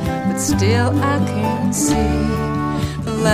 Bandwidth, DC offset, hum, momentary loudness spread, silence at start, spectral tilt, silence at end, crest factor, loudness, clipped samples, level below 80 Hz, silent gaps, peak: 15.5 kHz; under 0.1%; none; 5 LU; 0 s; -5.5 dB/octave; 0 s; 16 dB; -18 LUFS; under 0.1%; -30 dBFS; none; -2 dBFS